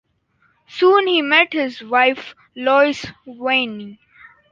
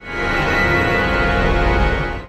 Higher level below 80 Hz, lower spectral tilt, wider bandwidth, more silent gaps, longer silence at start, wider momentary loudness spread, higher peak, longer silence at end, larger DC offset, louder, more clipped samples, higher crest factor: second, -62 dBFS vs -22 dBFS; second, -4 dB/octave vs -6 dB/octave; second, 7.4 kHz vs 12.5 kHz; neither; first, 0.7 s vs 0 s; first, 20 LU vs 4 LU; about the same, -2 dBFS vs -4 dBFS; first, 0.6 s vs 0 s; neither; about the same, -16 LUFS vs -17 LUFS; neither; first, 18 dB vs 12 dB